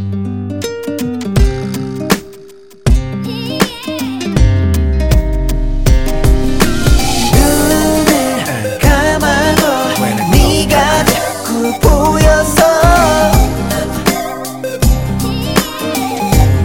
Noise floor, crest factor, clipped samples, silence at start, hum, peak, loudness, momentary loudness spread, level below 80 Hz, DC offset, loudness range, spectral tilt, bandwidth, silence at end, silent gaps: -37 dBFS; 12 dB; under 0.1%; 0 s; none; 0 dBFS; -13 LUFS; 10 LU; -16 dBFS; 0.7%; 6 LU; -5 dB/octave; 17 kHz; 0 s; none